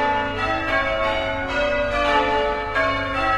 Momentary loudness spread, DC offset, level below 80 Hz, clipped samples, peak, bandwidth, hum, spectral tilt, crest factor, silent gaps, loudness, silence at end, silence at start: 4 LU; under 0.1%; -36 dBFS; under 0.1%; -6 dBFS; 11.5 kHz; none; -5 dB/octave; 16 dB; none; -21 LUFS; 0 s; 0 s